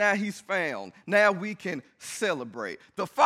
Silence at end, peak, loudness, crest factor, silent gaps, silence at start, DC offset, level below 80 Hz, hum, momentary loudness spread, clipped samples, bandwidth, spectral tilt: 0 s; -8 dBFS; -28 LUFS; 20 dB; none; 0 s; under 0.1%; -78 dBFS; none; 15 LU; under 0.1%; 15 kHz; -4 dB/octave